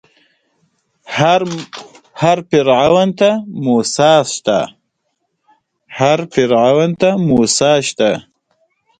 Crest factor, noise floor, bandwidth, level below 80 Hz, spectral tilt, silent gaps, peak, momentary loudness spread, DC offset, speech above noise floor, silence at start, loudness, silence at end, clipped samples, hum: 14 dB; -69 dBFS; 9.4 kHz; -52 dBFS; -4.5 dB/octave; none; 0 dBFS; 12 LU; under 0.1%; 57 dB; 1.05 s; -13 LUFS; 0.8 s; under 0.1%; none